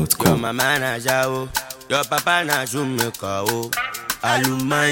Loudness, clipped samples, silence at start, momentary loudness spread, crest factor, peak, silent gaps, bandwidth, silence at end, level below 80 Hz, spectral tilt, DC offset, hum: -20 LUFS; under 0.1%; 0 s; 6 LU; 20 dB; 0 dBFS; none; 17 kHz; 0 s; -50 dBFS; -3.5 dB/octave; under 0.1%; none